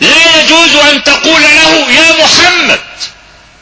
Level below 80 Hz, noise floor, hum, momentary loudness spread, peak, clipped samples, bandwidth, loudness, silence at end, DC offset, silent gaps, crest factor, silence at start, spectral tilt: -38 dBFS; -37 dBFS; none; 9 LU; 0 dBFS; 5%; 8 kHz; -3 LUFS; 0.5 s; under 0.1%; none; 6 dB; 0 s; -1 dB/octave